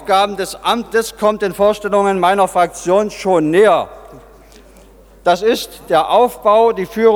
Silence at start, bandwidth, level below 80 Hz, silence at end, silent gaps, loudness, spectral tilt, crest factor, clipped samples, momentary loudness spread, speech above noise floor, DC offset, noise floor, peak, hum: 0 s; 18.5 kHz; -46 dBFS; 0 s; none; -14 LUFS; -4.5 dB/octave; 14 dB; under 0.1%; 6 LU; 29 dB; under 0.1%; -43 dBFS; 0 dBFS; none